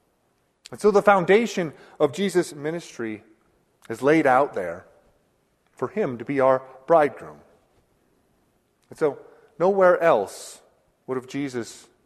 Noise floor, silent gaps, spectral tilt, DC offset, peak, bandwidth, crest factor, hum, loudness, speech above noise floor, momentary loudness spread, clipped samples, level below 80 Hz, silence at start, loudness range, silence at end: -68 dBFS; none; -5.5 dB/octave; under 0.1%; -2 dBFS; 13.5 kHz; 22 dB; none; -22 LUFS; 46 dB; 20 LU; under 0.1%; -66 dBFS; 0.7 s; 3 LU; 0.3 s